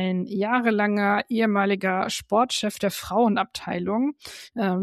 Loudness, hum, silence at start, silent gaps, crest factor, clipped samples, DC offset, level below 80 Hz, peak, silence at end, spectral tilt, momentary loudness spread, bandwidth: -24 LUFS; none; 0 s; none; 16 dB; under 0.1%; under 0.1%; -60 dBFS; -8 dBFS; 0 s; -5 dB/octave; 7 LU; 14 kHz